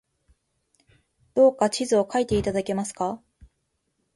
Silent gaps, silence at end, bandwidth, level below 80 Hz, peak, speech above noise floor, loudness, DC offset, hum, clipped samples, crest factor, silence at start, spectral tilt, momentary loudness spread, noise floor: none; 1 s; 11.5 kHz; -50 dBFS; -8 dBFS; 52 dB; -24 LUFS; under 0.1%; none; under 0.1%; 18 dB; 1.35 s; -5 dB/octave; 11 LU; -75 dBFS